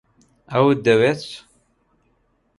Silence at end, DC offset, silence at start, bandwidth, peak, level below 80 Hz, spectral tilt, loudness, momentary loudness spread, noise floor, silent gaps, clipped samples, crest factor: 1.2 s; under 0.1%; 0.5 s; 11.5 kHz; -2 dBFS; -60 dBFS; -6.5 dB/octave; -18 LUFS; 19 LU; -64 dBFS; none; under 0.1%; 18 dB